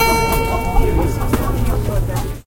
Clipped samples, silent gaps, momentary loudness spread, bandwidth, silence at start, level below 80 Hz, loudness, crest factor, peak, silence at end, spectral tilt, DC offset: under 0.1%; none; 4 LU; 17 kHz; 0 s; -20 dBFS; -18 LUFS; 14 dB; -2 dBFS; 0.05 s; -5.5 dB/octave; under 0.1%